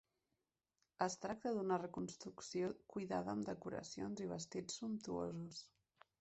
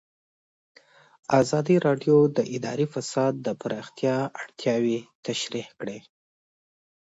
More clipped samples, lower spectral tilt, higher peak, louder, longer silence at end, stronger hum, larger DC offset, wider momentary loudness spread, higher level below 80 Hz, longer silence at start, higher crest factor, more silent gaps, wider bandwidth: neither; about the same, -5 dB/octave vs -6 dB/octave; second, -24 dBFS vs -6 dBFS; second, -45 LUFS vs -25 LUFS; second, 0.55 s vs 1 s; neither; neither; second, 7 LU vs 13 LU; second, -76 dBFS vs -68 dBFS; second, 1 s vs 1.3 s; about the same, 22 dB vs 20 dB; second, none vs 5.15-5.23 s; about the same, 8.2 kHz vs 8 kHz